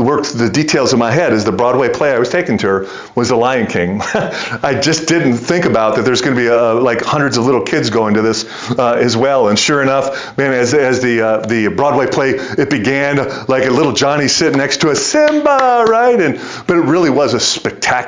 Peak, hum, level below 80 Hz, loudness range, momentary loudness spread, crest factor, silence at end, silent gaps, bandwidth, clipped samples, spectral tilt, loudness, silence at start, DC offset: -2 dBFS; none; -46 dBFS; 2 LU; 5 LU; 12 dB; 0 s; none; 7.8 kHz; under 0.1%; -4.5 dB/octave; -13 LUFS; 0 s; under 0.1%